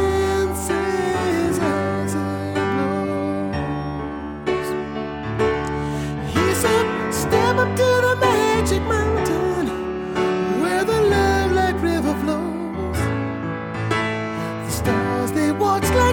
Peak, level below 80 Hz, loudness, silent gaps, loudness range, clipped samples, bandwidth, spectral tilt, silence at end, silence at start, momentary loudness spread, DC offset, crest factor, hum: -4 dBFS; -36 dBFS; -21 LUFS; none; 5 LU; under 0.1%; 19.5 kHz; -5.5 dB/octave; 0 s; 0 s; 9 LU; under 0.1%; 16 dB; none